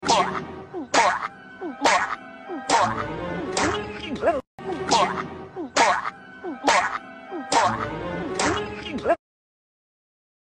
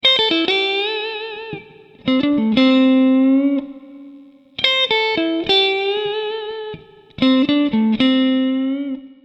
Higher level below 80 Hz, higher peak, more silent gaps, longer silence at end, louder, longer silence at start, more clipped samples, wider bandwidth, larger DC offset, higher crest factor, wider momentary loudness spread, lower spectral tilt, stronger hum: about the same, -52 dBFS vs -56 dBFS; second, -6 dBFS vs 0 dBFS; first, 4.47-4.58 s vs none; first, 1.3 s vs 0.1 s; second, -24 LUFS vs -16 LUFS; about the same, 0 s vs 0.05 s; neither; first, 11.5 kHz vs 7.8 kHz; neither; about the same, 18 dB vs 18 dB; about the same, 15 LU vs 15 LU; second, -3 dB/octave vs -5.5 dB/octave; neither